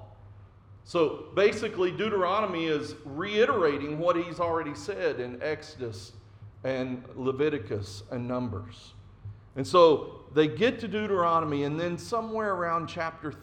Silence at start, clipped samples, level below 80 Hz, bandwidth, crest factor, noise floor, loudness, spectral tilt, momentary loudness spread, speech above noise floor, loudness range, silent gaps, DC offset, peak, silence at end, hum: 0 s; under 0.1%; -60 dBFS; 10.5 kHz; 20 dB; -51 dBFS; -28 LUFS; -6 dB/octave; 14 LU; 24 dB; 7 LU; none; under 0.1%; -8 dBFS; 0 s; none